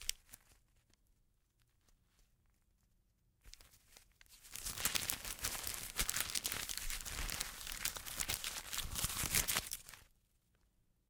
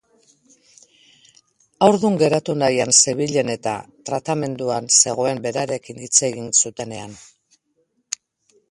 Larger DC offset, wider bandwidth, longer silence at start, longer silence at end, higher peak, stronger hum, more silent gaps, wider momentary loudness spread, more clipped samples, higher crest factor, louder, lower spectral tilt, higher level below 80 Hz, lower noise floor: neither; first, 19 kHz vs 11.5 kHz; second, 0 s vs 1.8 s; second, 1.05 s vs 1.55 s; second, -10 dBFS vs 0 dBFS; neither; neither; first, 20 LU vs 17 LU; neither; first, 34 dB vs 22 dB; second, -39 LUFS vs -18 LUFS; second, -0.5 dB/octave vs -3 dB/octave; first, -56 dBFS vs -62 dBFS; first, -76 dBFS vs -68 dBFS